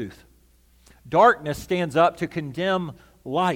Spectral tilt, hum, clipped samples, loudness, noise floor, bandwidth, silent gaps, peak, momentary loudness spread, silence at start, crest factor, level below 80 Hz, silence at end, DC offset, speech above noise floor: -6 dB/octave; none; under 0.1%; -22 LUFS; -57 dBFS; 16.5 kHz; none; -4 dBFS; 16 LU; 0 s; 20 dB; -54 dBFS; 0 s; under 0.1%; 35 dB